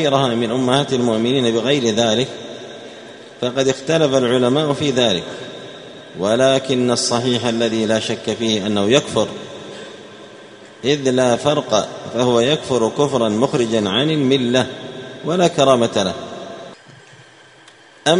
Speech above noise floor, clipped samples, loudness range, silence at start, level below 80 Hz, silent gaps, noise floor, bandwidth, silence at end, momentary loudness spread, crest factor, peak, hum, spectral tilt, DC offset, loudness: 29 dB; under 0.1%; 3 LU; 0 s; -56 dBFS; none; -45 dBFS; 11 kHz; 0 s; 18 LU; 18 dB; 0 dBFS; none; -4.5 dB/octave; under 0.1%; -17 LUFS